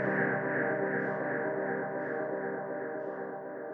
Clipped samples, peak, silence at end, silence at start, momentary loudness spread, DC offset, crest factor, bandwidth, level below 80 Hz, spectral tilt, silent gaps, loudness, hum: under 0.1%; -16 dBFS; 0 s; 0 s; 8 LU; under 0.1%; 18 dB; 3.6 kHz; -82 dBFS; -10.5 dB/octave; none; -33 LUFS; none